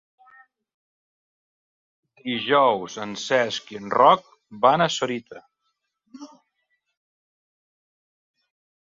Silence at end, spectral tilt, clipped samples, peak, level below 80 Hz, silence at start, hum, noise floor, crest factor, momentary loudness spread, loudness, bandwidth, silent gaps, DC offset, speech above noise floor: 2.55 s; -4 dB/octave; under 0.1%; -2 dBFS; -70 dBFS; 2.25 s; none; -76 dBFS; 24 dB; 14 LU; -21 LUFS; 7.8 kHz; none; under 0.1%; 55 dB